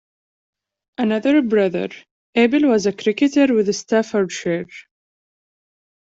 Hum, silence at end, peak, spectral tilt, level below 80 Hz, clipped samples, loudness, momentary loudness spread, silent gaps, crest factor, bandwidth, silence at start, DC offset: none; 1.2 s; -4 dBFS; -5 dB/octave; -62 dBFS; under 0.1%; -18 LUFS; 11 LU; 2.11-2.33 s; 16 dB; 7.8 kHz; 1 s; under 0.1%